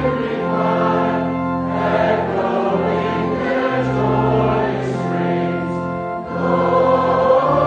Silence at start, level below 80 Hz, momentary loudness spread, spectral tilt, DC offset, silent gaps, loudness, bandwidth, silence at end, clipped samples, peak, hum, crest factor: 0 s; -42 dBFS; 7 LU; -8 dB/octave; under 0.1%; none; -18 LUFS; 8.6 kHz; 0 s; under 0.1%; -2 dBFS; none; 16 dB